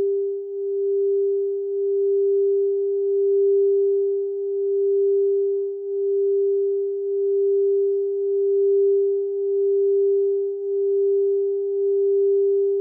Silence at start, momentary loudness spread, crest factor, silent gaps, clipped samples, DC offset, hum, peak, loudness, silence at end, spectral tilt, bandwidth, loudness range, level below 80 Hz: 0 s; 6 LU; 6 dB; none; under 0.1%; under 0.1%; none; -14 dBFS; -21 LUFS; 0 s; -11 dB/octave; 0.8 kHz; 1 LU; under -90 dBFS